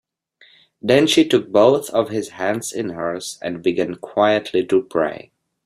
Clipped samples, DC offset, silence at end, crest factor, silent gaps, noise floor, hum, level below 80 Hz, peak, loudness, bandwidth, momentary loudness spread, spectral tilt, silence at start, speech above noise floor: under 0.1%; under 0.1%; 0.45 s; 18 dB; none; -54 dBFS; none; -60 dBFS; -2 dBFS; -19 LUFS; 14.5 kHz; 11 LU; -4.5 dB/octave; 0.85 s; 36 dB